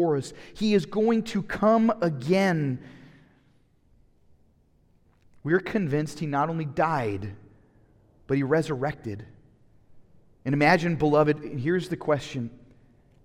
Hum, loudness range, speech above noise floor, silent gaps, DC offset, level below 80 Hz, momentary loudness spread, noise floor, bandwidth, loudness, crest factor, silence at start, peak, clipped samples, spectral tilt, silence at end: none; 7 LU; 37 dB; none; under 0.1%; -56 dBFS; 15 LU; -62 dBFS; 14.5 kHz; -25 LUFS; 20 dB; 0 s; -6 dBFS; under 0.1%; -7 dB/octave; 0.7 s